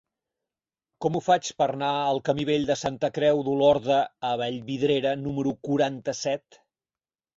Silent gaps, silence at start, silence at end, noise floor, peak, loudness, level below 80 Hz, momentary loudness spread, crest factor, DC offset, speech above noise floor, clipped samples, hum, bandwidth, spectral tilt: none; 1 s; 1 s; under -90 dBFS; -8 dBFS; -25 LUFS; -62 dBFS; 8 LU; 18 dB; under 0.1%; over 65 dB; under 0.1%; none; 7.8 kHz; -5 dB/octave